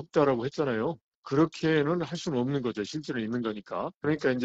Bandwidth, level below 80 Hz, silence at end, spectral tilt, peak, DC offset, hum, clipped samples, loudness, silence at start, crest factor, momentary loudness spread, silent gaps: 8 kHz; -64 dBFS; 0 s; -6.5 dB/octave; -12 dBFS; under 0.1%; none; under 0.1%; -29 LUFS; 0 s; 16 dB; 8 LU; 1.01-1.23 s, 3.96-4.01 s